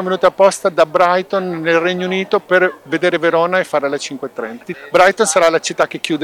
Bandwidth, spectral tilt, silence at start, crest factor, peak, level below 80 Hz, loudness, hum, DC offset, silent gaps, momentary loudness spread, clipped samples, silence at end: 17 kHz; -3.5 dB/octave; 0 s; 14 dB; 0 dBFS; -58 dBFS; -15 LUFS; none; under 0.1%; none; 11 LU; under 0.1%; 0 s